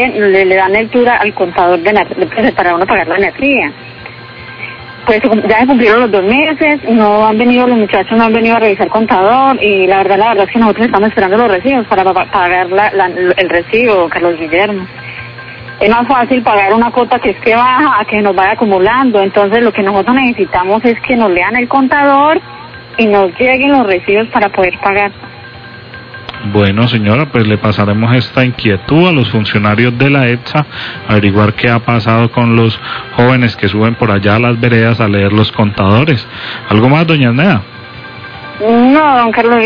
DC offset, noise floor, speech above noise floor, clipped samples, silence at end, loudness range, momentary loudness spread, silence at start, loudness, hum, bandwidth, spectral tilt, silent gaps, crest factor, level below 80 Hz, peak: under 0.1%; -30 dBFS; 21 dB; 0.7%; 0 s; 3 LU; 13 LU; 0 s; -9 LUFS; none; 5.4 kHz; -9 dB/octave; none; 10 dB; -40 dBFS; 0 dBFS